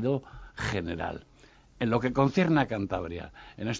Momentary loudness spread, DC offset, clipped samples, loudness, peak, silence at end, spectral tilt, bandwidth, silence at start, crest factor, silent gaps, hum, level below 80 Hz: 16 LU; under 0.1%; under 0.1%; -29 LUFS; -10 dBFS; 0 s; -6.5 dB/octave; 7.8 kHz; 0 s; 20 dB; none; none; -50 dBFS